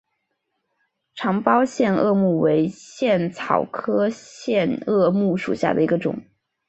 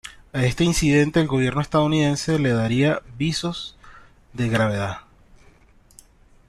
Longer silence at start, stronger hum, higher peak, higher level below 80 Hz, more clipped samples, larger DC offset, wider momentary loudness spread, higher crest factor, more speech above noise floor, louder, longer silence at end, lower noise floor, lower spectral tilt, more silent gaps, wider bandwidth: first, 1.15 s vs 0.05 s; neither; first, -2 dBFS vs -6 dBFS; second, -62 dBFS vs -42 dBFS; neither; neither; second, 8 LU vs 12 LU; about the same, 20 dB vs 16 dB; first, 55 dB vs 33 dB; about the same, -21 LUFS vs -21 LUFS; second, 0.5 s vs 1.5 s; first, -75 dBFS vs -53 dBFS; first, -7 dB/octave vs -5.5 dB/octave; neither; second, 8.2 kHz vs 13 kHz